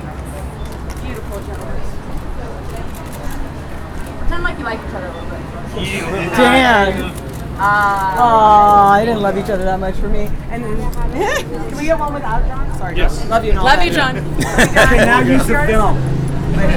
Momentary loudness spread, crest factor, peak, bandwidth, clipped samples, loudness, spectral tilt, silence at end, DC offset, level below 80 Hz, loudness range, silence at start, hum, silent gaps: 18 LU; 14 dB; 0 dBFS; 16.5 kHz; under 0.1%; -14 LUFS; -5 dB/octave; 0 s; under 0.1%; -22 dBFS; 15 LU; 0 s; none; none